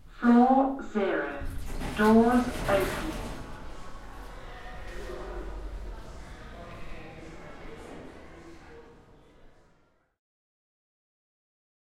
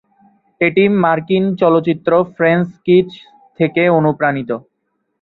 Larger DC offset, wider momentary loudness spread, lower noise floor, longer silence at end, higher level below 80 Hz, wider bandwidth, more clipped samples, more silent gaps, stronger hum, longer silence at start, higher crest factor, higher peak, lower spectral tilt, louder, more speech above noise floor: neither; first, 25 LU vs 7 LU; about the same, -66 dBFS vs -69 dBFS; first, 2.3 s vs 0.6 s; first, -44 dBFS vs -56 dBFS; first, 15.5 kHz vs 4.6 kHz; neither; neither; neither; second, 0 s vs 0.6 s; first, 20 dB vs 14 dB; second, -10 dBFS vs -2 dBFS; second, -6 dB/octave vs -9.5 dB/octave; second, -26 LUFS vs -14 LUFS; second, 41 dB vs 56 dB